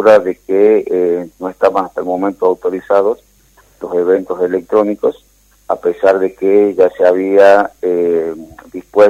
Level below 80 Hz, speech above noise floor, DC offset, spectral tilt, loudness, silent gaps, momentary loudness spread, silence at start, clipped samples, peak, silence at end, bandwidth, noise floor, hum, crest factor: -52 dBFS; 37 dB; under 0.1%; -6.5 dB/octave; -13 LUFS; none; 10 LU; 0 s; 0.2%; 0 dBFS; 0 s; 13 kHz; -49 dBFS; none; 12 dB